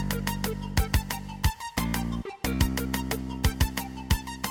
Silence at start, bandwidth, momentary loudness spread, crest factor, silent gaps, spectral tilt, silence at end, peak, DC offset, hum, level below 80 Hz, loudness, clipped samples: 0 s; 17 kHz; 5 LU; 20 dB; none; -4.5 dB/octave; 0 s; -8 dBFS; under 0.1%; none; -32 dBFS; -29 LUFS; under 0.1%